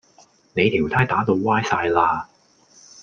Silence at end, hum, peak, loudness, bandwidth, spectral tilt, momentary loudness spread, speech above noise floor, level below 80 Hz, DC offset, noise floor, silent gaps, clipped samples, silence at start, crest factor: 0.8 s; none; -2 dBFS; -20 LUFS; 7.4 kHz; -6 dB/octave; 9 LU; 35 dB; -52 dBFS; under 0.1%; -55 dBFS; none; under 0.1%; 0.55 s; 18 dB